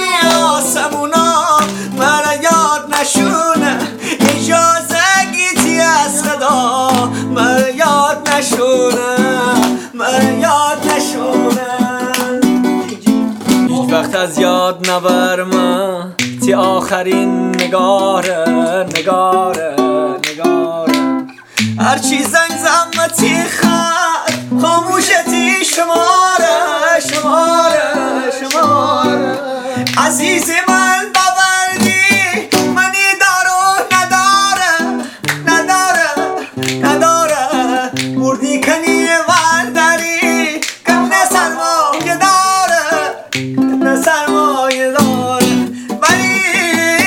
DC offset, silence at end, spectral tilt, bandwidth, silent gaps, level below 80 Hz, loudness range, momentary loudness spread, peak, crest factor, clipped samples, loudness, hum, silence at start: under 0.1%; 0 s; -3 dB/octave; 20 kHz; none; -54 dBFS; 3 LU; 6 LU; 0 dBFS; 12 dB; under 0.1%; -12 LUFS; none; 0 s